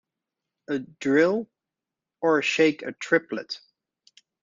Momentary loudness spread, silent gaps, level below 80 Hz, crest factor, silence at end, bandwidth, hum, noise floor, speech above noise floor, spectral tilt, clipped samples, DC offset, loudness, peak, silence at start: 14 LU; none; -72 dBFS; 22 dB; 0.85 s; 7.6 kHz; none; -88 dBFS; 64 dB; -4.5 dB/octave; under 0.1%; under 0.1%; -24 LUFS; -6 dBFS; 0.7 s